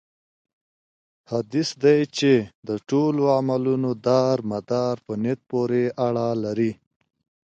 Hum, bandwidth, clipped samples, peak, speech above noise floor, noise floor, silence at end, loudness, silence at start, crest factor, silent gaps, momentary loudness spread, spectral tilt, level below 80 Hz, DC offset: none; 8.8 kHz; under 0.1%; -6 dBFS; over 68 dB; under -90 dBFS; 0.8 s; -23 LUFS; 1.3 s; 18 dB; 2.55-2.63 s; 7 LU; -6.5 dB/octave; -64 dBFS; under 0.1%